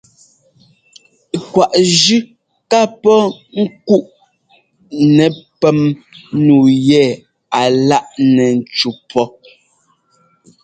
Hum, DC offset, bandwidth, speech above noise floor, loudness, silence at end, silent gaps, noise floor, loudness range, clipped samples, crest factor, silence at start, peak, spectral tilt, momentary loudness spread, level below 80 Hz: none; under 0.1%; 9.4 kHz; 46 dB; -13 LUFS; 1.35 s; none; -58 dBFS; 3 LU; under 0.1%; 14 dB; 1.35 s; 0 dBFS; -5 dB/octave; 10 LU; -56 dBFS